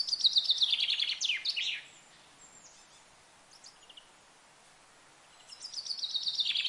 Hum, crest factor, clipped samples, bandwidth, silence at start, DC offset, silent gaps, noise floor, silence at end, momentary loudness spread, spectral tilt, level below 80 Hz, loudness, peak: none; 22 dB; under 0.1%; 11.5 kHz; 0 s; under 0.1%; none; -60 dBFS; 0 s; 21 LU; 3 dB/octave; -80 dBFS; -29 LUFS; -14 dBFS